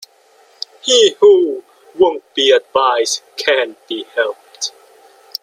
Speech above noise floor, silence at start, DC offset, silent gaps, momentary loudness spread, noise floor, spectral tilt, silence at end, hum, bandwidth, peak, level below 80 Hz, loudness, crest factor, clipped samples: 37 dB; 0.85 s; under 0.1%; none; 15 LU; -50 dBFS; -0.5 dB/octave; 0.75 s; none; 16 kHz; 0 dBFS; -64 dBFS; -14 LUFS; 16 dB; under 0.1%